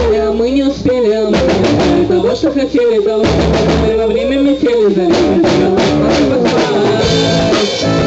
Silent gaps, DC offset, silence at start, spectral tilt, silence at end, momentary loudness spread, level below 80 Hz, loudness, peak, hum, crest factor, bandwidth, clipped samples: none; under 0.1%; 0 s; -6 dB/octave; 0 s; 2 LU; -28 dBFS; -11 LUFS; -2 dBFS; none; 8 dB; 8.4 kHz; under 0.1%